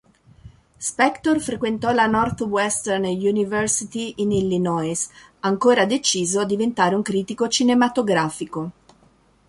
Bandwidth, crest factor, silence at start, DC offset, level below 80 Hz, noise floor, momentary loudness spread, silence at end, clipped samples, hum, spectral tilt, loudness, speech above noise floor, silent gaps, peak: 11.5 kHz; 18 dB; 0.45 s; under 0.1%; -52 dBFS; -57 dBFS; 10 LU; 0.75 s; under 0.1%; none; -4 dB/octave; -21 LUFS; 36 dB; none; -4 dBFS